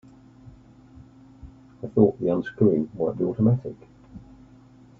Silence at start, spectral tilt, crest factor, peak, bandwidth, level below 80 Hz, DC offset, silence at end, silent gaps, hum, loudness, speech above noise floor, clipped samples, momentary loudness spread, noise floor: 0.95 s; -11 dB/octave; 22 dB; -4 dBFS; 4 kHz; -56 dBFS; under 0.1%; 0.8 s; none; none; -23 LUFS; 29 dB; under 0.1%; 19 LU; -51 dBFS